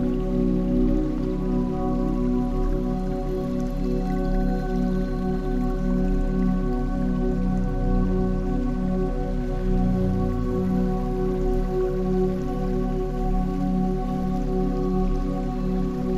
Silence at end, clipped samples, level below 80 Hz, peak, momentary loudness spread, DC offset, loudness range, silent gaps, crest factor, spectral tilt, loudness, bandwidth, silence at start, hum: 0 s; under 0.1%; -28 dBFS; -10 dBFS; 3 LU; under 0.1%; 1 LU; none; 12 dB; -9 dB/octave; -25 LUFS; 7.2 kHz; 0 s; none